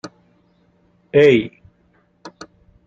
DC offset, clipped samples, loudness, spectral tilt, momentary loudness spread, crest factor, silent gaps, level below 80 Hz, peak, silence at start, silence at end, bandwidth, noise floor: under 0.1%; under 0.1%; -15 LUFS; -6.5 dB/octave; 27 LU; 20 dB; none; -58 dBFS; -2 dBFS; 0.05 s; 0.55 s; 7.6 kHz; -59 dBFS